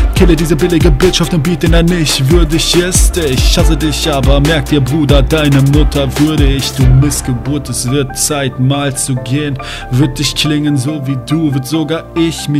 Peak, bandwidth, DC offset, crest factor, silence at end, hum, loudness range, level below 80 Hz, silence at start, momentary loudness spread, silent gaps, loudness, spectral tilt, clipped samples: 0 dBFS; 16 kHz; under 0.1%; 10 dB; 0 s; none; 4 LU; -16 dBFS; 0 s; 6 LU; none; -11 LUFS; -5 dB/octave; 0.8%